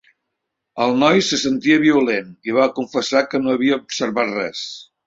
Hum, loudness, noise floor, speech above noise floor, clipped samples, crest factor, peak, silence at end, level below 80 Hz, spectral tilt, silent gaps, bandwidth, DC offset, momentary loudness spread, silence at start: none; -18 LUFS; -78 dBFS; 60 dB; under 0.1%; 18 dB; -2 dBFS; 0.25 s; -62 dBFS; -4 dB/octave; none; 8 kHz; under 0.1%; 9 LU; 0.75 s